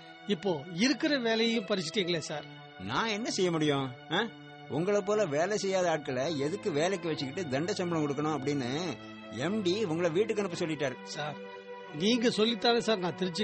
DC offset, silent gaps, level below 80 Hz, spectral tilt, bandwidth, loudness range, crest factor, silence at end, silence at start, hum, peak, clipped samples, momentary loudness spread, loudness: under 0.1%; none; -70 dBFS; -4.5 dB/octave; 8.4 kHz; 2 LU; 16 dB; 0 s; 0 s; none; -14 dBFS; under 0.1%; 11 LU; -31 LUFS